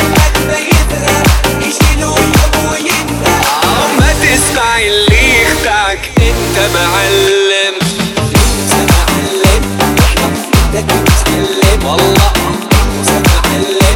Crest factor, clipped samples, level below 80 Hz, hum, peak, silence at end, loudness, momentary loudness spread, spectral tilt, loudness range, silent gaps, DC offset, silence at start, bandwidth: 10 dB; 0.4%; -16 dBFS; none; 0 dBFS; 0 s; -9 LUFS; 4 LU; -4 dB/octave; 1 LU; none; under 0.1%; 0 s; 19 kHz